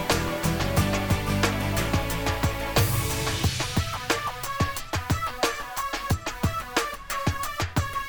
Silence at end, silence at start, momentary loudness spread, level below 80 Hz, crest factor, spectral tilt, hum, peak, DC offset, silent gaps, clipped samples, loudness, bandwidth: 0 s; 0 s; 5 LU; -36 dBFS; 18 dB; -4.5 dB/octave; none; -10 dBFS; under 0.1%; none; under 0.1%; -26 LUFS; over 20 kHz